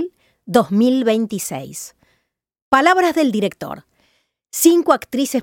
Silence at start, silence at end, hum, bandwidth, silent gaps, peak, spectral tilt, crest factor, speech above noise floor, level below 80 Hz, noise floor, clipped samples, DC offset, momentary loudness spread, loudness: 0 s; 0 s; none; 17 kHz; 2.62-2.71 s; 0 dBFS; -4 dB/octave; 18 dB; 53 dB; -58 dBFS; -69 dBFS; under 0.1%; under 0.1%; 18 LU; -16 LUFS